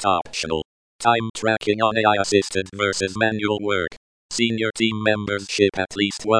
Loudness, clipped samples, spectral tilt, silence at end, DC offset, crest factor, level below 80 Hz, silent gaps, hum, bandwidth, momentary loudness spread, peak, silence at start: -21 LUFS; under 0.1%; -4 dB/octave; 0 s; under 0.1%; 18 dB; -54 dBFS; 0.65-0.99 s, 1.30-1.34 s, 3.97-4.29 s; none; 10.5 kHz; 7 LU; -4 dBFS; 0 s